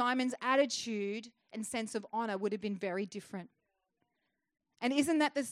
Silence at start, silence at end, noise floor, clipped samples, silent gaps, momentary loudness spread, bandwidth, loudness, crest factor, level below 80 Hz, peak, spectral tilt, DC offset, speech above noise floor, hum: 0 s; 0 s; -84 dBFS; under 0.1%; none; 14 LU; 14 kHz; -35 LUFS; 18 dB; -82 dBFS; -18 dBFS; -3.5 dB/octave; under 0.1%; 50 dB; none